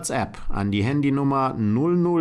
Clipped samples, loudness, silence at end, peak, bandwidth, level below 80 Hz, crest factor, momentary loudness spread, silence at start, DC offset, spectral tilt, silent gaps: under 0.1%; -23 LUFS; 0 s; -12 dBFS; 12 kHz; -38 dBFS; 10 dB; 7 LU; 0 s; under 0.1%; -6.5 dB/octave; none